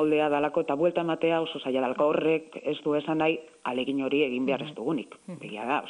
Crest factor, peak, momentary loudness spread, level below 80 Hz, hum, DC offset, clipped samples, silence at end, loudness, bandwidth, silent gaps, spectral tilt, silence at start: 16 dB; -12 dBFS; 9 LU; -70 dBFS; none; under 0.1%; under 0.1%; 0 s; -27 LUFS; 10.5 kHz; none; -6.5 dB/octave; 0 s